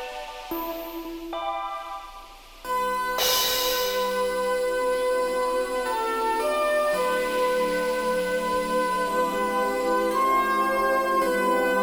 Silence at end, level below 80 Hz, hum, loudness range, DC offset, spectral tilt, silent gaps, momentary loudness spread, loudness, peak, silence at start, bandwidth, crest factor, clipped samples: 0 s; -50 dBFS; none; 3 LU; under 0.1%; -2.5 dB/octave; none; 12 LU; -24 LUFS; -10 dBFS; 0 s; over 20 kHz; 14 dB; under 0.1%